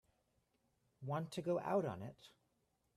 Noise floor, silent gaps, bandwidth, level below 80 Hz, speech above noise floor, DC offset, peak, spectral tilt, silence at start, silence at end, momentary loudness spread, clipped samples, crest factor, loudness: -82 dBFS; none; 14.5 kHz; -82 dBFS; 41 dB; under 0.1%; -26 dBFS; -7 dB/octave; 1 s; 0.65 s; 15 LU; under 0.1%; 20 dB; -41 LUFS